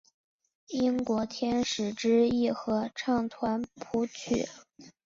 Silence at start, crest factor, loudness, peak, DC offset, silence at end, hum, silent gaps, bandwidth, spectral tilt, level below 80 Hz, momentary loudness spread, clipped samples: 0.7 s; 16 dB; -30 LUFS; -14 dBFS; under 0.1%; 0.15 s; none; none; 7.6 kHz; -4.5 dB/octave; -60 dBFS; 7 LU; under 0.1%